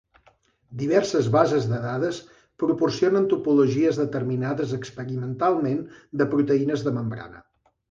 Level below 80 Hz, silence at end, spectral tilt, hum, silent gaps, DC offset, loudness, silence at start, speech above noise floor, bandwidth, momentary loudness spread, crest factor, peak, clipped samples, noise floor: -60 dBFS; 0.5 s; -7 dB/octave; none; none; under 0.1%; -24 LUFS; 0.7 s; 38 dB; 7.6 kHz; 11 LU; 20 dB; -4 dBFS; under 0.1%; -61 dBFS